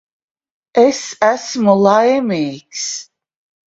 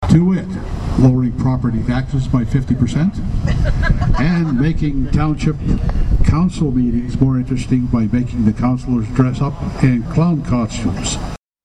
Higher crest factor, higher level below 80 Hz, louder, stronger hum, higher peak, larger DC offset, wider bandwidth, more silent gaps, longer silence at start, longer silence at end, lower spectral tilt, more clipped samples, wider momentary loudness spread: about the same, 16 dB vs 14 dB; second, -62 dBFS vs -22 dBFS; about the same, -15 LUFS vs -17 LUFS; neither; about the same, 0 dBFS vs -2 dBFS; neither; second, 8 kHz vs 10 kHz; neither; first, 0.75 s vs 0 s; first, 0.65 s vs 0.3 s; second, -4.5 dB/octave vs -7.5 dB/octave; neither; first, 12 LU vs 6 LU